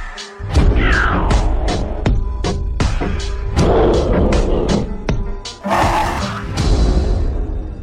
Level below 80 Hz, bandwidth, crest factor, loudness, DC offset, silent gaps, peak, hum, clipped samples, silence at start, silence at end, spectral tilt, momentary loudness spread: -18 dBFS; 11.5 kHz; 12 dB; -18 LUFS; under 0.1%; none; -4 dBFS; none; under 0.1%; 0 s; 0 s; -6 dB/octave; 9 LU